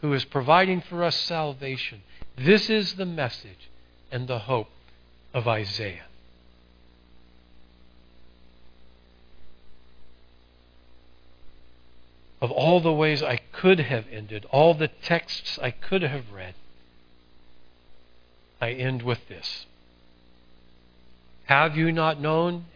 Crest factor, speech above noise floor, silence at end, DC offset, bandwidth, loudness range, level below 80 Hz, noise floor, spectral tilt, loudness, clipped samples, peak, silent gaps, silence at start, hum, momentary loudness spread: 26 dB; 31 dB; 0.1 s; under 0.1%; 5.4 kHz; 11 LU; -58 dBFS; -55 dBFS; -6.5 dB/octave; -24 LUFS; under 0.1%; -2 dBFS; none; 0 s; 60 Hz at -55 dBFS; 15 LU